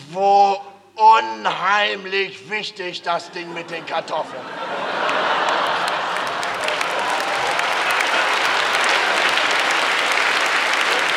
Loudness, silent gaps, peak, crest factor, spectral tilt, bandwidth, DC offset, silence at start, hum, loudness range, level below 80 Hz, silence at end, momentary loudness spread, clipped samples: -18 LUFS; none; -2 dBFS; 16 dB; -1 dB/octave; 17 kHz; under 0.1%; 0 s; none; 6 LU; -66 dBFS; 0 s; 11 LU; under 0.1%